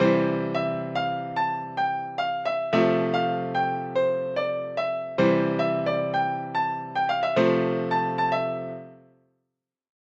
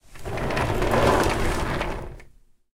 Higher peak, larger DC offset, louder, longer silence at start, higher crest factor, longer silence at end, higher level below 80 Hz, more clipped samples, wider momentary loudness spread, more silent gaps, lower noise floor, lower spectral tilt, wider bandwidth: about the same, -8 dBFS vs -6 dBFS; neither; about the same, -25 LUFS vs -24 LUFS; about the same, 0 s vs 0.1 s; about the same, 18 dB vs 18 dB; first, 1.25 s vs 0.45 s; second, -68 dBFS vs -32 dBFS; neither; second, 6 LU vs 14 LU; neither; first, -82 dBFS vs -52 dBFS; first, -7.5 dB/octave vs -5.5 dB/octave; second, 7.8 kHz vs 16.5 kHz